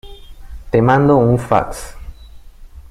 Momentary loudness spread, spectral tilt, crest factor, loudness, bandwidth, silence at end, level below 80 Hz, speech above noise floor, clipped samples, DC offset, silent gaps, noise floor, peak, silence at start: 18 LU; -7.5 dB/octave; 16 dB; -14 LUFS; 14 kHz; 0.1 s; -34 dBFS; 24 dB; under 0.1%; under 0.1%; none; -37 dBFS; 0 dBFS; 0.05 s